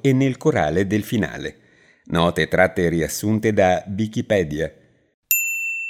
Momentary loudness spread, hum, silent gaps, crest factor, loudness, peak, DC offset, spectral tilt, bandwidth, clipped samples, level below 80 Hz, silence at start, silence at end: 8 LU; none; 5.14-5.23 s; 18 dB; -20 LUFS; -2 dBFS; under 0.1%; -5 dB/octave; 17 kHz; under 0.1%; -48 dBFS; 0.05 s; 0 s